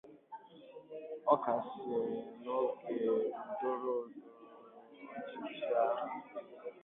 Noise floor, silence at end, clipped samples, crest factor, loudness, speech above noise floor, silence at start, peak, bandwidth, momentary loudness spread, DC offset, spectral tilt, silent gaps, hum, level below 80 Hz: -57 dBFS; 0 s; under 0.1%; 24 dB; -37 LUFS; 20 dB; 0.05 s; -14 dBFS; 4 kHz; 22 LU; under 0.1%; -4 dB/octave; none; none; -86 dBFS